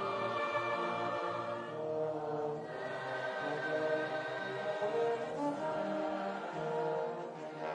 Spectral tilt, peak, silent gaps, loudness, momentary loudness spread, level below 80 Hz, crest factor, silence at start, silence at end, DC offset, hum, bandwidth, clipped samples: -5.5 dB/octave; -22 dBFS; none; -37 LUFS; 6 LU; -82 dBFS; 14 dB; 0 s; 0 s; under 0.1%; none; 10 kHz; under 0.1%